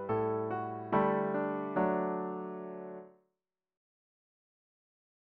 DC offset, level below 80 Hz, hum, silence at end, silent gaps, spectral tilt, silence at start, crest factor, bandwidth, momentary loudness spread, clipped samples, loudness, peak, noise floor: under 0.1%; -72 dBFS; none; 2.25 s; none; -7 dB/octave; 0 s; 20 dB; 4.5 kHz; 13 LU; under 0.1%; -34 LUFS; -16 dBFS; -88 dBFS